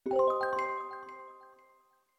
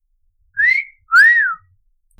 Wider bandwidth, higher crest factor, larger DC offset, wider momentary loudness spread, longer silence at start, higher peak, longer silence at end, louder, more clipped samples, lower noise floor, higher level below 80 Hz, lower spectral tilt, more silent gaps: second, 9 kHz vs 19.5 kHz; about the same, 16 dB vs 14 dB; neither; first, 20 LU vs 17 LU; second, 0.05 s vs 0.55 s; second, -18 dBFS vs -4 dBFS; about the same, 0.7 s vs 0.65 s; second, -32 LUFS vs -12 LUFS; neither; first, -67 dBFS vs -60 dBFS; second, -74 dBFS vs -60 dBFS; first, -5 dB/octave vs 3 dB/octave; neither